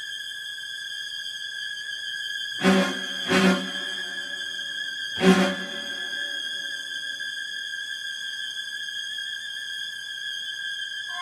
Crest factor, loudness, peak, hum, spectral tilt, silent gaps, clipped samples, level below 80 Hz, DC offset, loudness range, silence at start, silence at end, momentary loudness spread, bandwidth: 24 dB; -27 LUFS; -4 dBFS; none; -4 dB/octave; none; under 0.1%; -66 dBFS; under 0.1%; 6 LU; 0 s; 0 s; 10 LU; 14.5 kHz